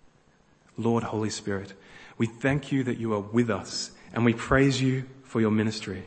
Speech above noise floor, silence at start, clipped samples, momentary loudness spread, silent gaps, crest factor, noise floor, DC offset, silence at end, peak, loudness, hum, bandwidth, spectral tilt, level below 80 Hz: 35 dB; 0.8 s; under 0.1%; 11 LU; none; 20 dB; -61 dBFS; under 0.1%; 0 s; -6 dBFS; -27 LUFS; none; 8.8 kHz; -6 dB/octave; -50 dBFS